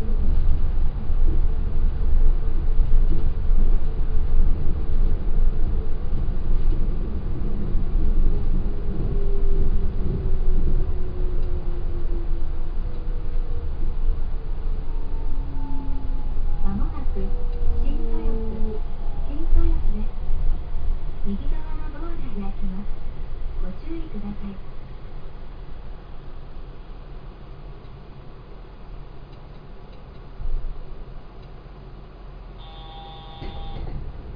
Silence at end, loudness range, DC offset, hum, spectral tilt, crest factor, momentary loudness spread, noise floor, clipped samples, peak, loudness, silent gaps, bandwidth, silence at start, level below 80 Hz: 0 s; 15 LU; under 0.1%; none; -10.5 dB/octave; 14 dB; 17 LU; -39 dBFS; under 0.1%; -4 dBFS; -29 LUFS; none; 3.7 kHz; 0 s; -20 dBFS